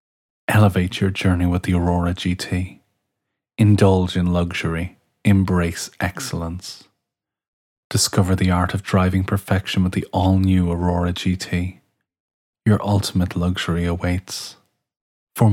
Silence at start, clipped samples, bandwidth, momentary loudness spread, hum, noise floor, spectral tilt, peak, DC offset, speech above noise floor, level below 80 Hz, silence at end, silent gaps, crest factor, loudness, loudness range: 0.5 s; under 0.1%; 16 kHz; 12 LU; none; -83 dBFS; -6 dB/octave; 0 dBFS; under 0.1%; 64 dB; -40 dBFS; 0 s; 7.48-7.90 s, 12.20-12.53 s, 15.01-15.27 s; 20 dB; -20 LUFS; 4 LU